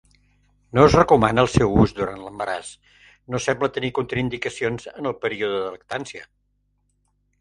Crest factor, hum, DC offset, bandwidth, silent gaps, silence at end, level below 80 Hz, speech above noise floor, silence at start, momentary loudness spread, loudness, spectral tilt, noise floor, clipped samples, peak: 22 dB; 50 Hz at -50 dBFS; under 0.1%; 11 kHz; none; 1.15 s; -42 dBFS; 47 dB; 0.75 s; 15 LU; -21 LUFS; -6 dB/octave; -68 dBFS; under 0.1%; 0 dBFS